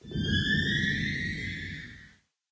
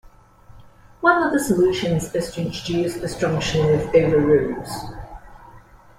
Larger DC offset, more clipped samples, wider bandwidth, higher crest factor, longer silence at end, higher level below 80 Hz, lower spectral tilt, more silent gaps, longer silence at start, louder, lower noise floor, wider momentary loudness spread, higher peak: neither; neither; second, 8 kHz vs 16 kHz; about the same, 16 dB vs 18 dB; about the same, 0.45 s vs 0.4 s; about the same, -44 dBFS vs -44 dBFS; about the same, -5 dB/octave vs -6 dB/octave; neither; about the same, 0.05 s vs 0.05 s; second, -29 LUFS vs -20 LUFS; first, -58 dBFS vs -47 dBFS; about the same, 14 LU vs 14 LU; second, -16 dBFS vs -2 dBFS